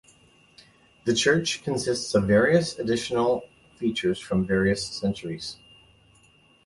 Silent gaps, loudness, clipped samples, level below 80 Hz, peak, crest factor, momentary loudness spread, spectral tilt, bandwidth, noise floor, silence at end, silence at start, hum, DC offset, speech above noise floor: none; -25 LUFS; under 0.1%; -52 dBFS; -8 dBFS; 18 dB; 12 LU; -4.5 dB/octave; 11.5 kHz; -59 dBFS; 1.1 s; 1.05 s; none; under 0.1%; 35 dB